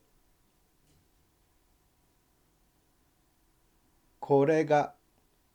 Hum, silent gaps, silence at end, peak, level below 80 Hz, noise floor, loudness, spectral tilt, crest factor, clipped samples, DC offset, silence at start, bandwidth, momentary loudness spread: none; none; 0.65 s; -12 dBFS; -72 dBFS; -69 dBFS; -27 LUFS; -7 dB/octave; 22 dB; under 0.1%; under 0.1%; 4.2 s; 10.5 kHz; 14 LU